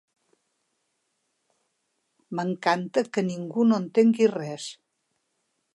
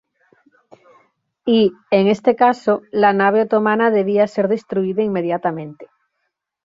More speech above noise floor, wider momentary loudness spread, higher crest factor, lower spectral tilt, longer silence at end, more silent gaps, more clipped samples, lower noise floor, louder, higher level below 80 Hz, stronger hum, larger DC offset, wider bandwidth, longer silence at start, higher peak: second, 52 dB vs 58 dB; first, 14 LU vs 7 LU; about the same, 20 dB vs 16 dB; about the same, -6 dB/octave vs -7 dB/octave; first, 1 s vs 0.8 s; neither; neither; about the same, -76 dBFS vs -74 dBFS; second, -24 LUFS vs -17 LUFS; second, -80 dBFS vs -64 dBFS; neither; neither; first, 11 kHz vs 7.6 kHz; first, 2.3 s vs 1.45 s; second, -8 dBFS vs -2 dBFS